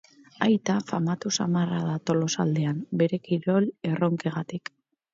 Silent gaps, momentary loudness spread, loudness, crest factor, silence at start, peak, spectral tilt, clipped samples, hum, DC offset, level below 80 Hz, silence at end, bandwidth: none; 6 LU; -26 LUFS; 18 dB; 0.4 s; -8 dBFS; -6 dB/octave; under 0.1%; none; under 0.1%; -68 dBFS; 0.55 s; 7.8 kHz